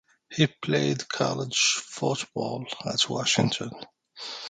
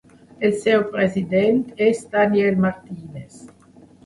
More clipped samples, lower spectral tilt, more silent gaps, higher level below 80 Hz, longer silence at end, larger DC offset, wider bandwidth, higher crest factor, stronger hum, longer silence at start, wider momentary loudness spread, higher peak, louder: neither; second, -3.5 dB/octave vs -6.5 dB/octave; neither; second, -66 dBFS vs -58 dBFS; second, 0 s vs 0.6 s; neither; second, 9.6 kHz vs 11.5 kHz; about the same, 20 dB vs 16 dB; neither; about the same, 0.3 s vs 0.4 s; second, 14 LU vs 18 LU; second, -8 dBFS vs -4 dBFS; second, -26 LUFS vs -19 LUFS